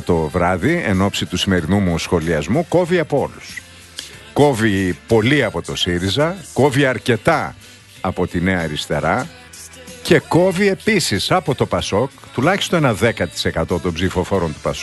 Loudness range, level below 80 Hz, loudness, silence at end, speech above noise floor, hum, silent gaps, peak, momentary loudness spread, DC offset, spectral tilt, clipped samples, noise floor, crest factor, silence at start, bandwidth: 2 LU; -40 dBFS; -17 LUFS; 0 s; 21 dB; none; none; 0 dBFS; 11 LU; under 0.1%; -5 dB/octave; under 0.1%; -38 dBFS; 18 dB; 0 s; 12.5 kHz